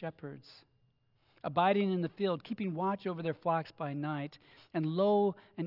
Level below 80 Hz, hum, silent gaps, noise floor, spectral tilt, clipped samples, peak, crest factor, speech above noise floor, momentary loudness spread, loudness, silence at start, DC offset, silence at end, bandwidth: -80 dBFS; none; none; -72 dBFS; -9.5 dB/octave; under 0.1%; -16 dBFS; 18 dB; 39 dB; 15 LU; -33 LUFS; 0 s; under 0.1%; 0 s; 5.8 kHz